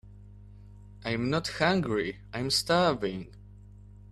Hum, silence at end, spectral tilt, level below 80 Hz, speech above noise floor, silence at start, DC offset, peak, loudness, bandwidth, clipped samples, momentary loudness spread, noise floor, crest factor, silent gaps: 50 Hz at -45 dBFS; 0.25 s; -4.5 dB/octave; -52 dBFS; 21 dB; 0.05 s; under 0.1%; -10 dBFS; -28 LUFS; 14 kHz; under 0.1%; 12 LU; -50 dBFS; 20 dB; none